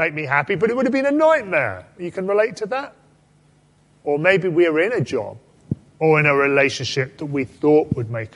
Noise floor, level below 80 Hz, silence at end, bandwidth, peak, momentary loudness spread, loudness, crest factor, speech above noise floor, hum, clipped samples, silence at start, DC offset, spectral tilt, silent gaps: -56 dBFS; -54 dBFS; 0.1 s; 11 kHz; -2 dBFS; 15 LU; -19 LUFS; 18 dB; 37 dB; none; under 0.1%; 0 s; under 0.1%; -6 dB/octave; none